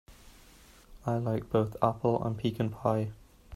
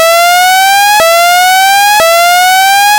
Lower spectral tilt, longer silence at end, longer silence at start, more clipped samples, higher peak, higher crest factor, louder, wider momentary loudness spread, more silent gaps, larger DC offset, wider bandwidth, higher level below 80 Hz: first, -8.5 dB/octave vs 1.5 dB/octave; about the same, 0 s vs 0 s; about the same, 0.1 s vs 0 s; second, under 0.1% vs 3%; second, -10 dBFS vs 0 dBFS; first, 22 dB vs 6 dB; second, -31 LUFS vs -5 LUFS; first, 6 LU vs 0 LU; neither; neither; second, 14 kHz vs over 20 kHz; second, -56 dBFS vs -46 dBFS